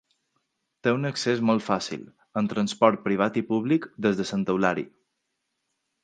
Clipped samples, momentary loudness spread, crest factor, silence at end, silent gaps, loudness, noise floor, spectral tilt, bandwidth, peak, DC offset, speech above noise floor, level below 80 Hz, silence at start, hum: under 0.1%; 10 LU; 22 dB; 1.15 s; none; -25 LUFS; -79 dBFS; -5.5 dB/octave; 9.4 kHz; -4 dBFS; under 0.1%; 54 dB; -66 dBFS; 0.85 s; none